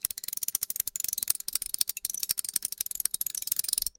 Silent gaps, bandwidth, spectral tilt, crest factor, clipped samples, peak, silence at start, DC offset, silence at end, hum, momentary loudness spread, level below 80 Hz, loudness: none; 17 kHz; 2.5 dB/octave; 30 dB; under 0.1%; -2 dBFS; 0.05 s; under 0.1%; 0.1 s; none; 4 LU; -62 dBFS; -29 LUFS